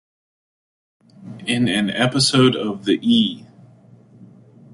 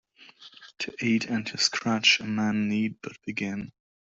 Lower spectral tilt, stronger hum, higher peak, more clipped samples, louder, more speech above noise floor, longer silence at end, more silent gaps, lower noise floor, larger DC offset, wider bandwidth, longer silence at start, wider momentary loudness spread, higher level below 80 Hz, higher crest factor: first, -4.5 dB/octave vs -3 dB/octave; neither; first, -4 dBFS vs -8 dBFS; neither; first, -18 LUFS vs -26 LUFS; first, 30 dB vs 25 dB; about the same, 0.5 s vs 0.45 s; neither; second, -48 dBFS vs -52 dBFS; neither; first, 11.5 kHz vs 8 kHz; first, 1.2 s vs 0.2 s; about the same, 14 LU vs 15 LU; first, -58 dBFS vs -68 dBFS; about the same, 18 dB vs 22 dB